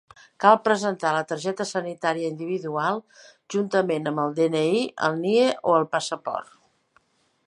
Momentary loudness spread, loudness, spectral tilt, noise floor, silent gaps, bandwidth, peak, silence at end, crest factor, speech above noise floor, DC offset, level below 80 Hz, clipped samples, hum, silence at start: 9 LU; -24 LUFS; -5 dB/octave; -64 dBFS; none; 11.5 kHz; -2 dBFS; 1.05 s; 22 dB; 41 dB; under 0.1%; -76 dBFS; under 0.1%; none; 0.4 s